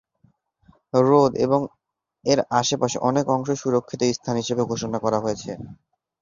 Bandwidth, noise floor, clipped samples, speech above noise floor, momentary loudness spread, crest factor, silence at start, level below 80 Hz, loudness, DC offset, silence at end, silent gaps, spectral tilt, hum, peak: 7.6 kHz; -63 dBFS; under 0.1%; 41 dB; 12 LU; 20 dB; 0.95 s; -58 dBFS; -22 LUFS; under 0.1%; 0.5 s; none; -5 dB/octave; none; -4 dBFS